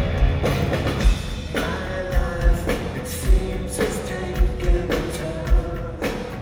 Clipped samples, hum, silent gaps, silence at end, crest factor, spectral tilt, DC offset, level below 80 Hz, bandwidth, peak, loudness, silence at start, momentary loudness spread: under 0.1%; none; none; 0 s; 16 dB; -5.5 dB/octave; under 0.1%; -24 dBFS; 16.5 kHz; -6 dBFS; -24 LUFS; 0 s; 6 LU